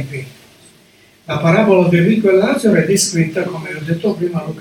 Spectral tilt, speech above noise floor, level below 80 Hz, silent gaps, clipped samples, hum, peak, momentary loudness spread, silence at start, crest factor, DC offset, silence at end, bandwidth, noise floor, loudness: -5.5 dB/octave; 34 dB; -54 dBFS; none; under 0.1%; none; 0 dBFS; 13 LU; 0 s; 16 dB; under 0.1%; 0 s; 17.5 kHz; -49 dBFS; -14 LUFS